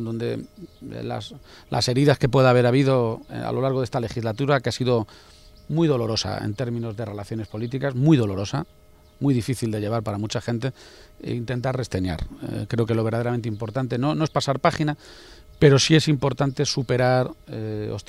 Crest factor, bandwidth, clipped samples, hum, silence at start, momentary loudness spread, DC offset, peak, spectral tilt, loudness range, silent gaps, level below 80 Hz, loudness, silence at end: 20 dB; 13.5 kHz; under 0.1%; none; 0 s; 14 LU; under 0.1%; -2 dBFS; -6 dB/octave; 6 LU; none; -48 dBFS; -23 LUFS; 0.1 s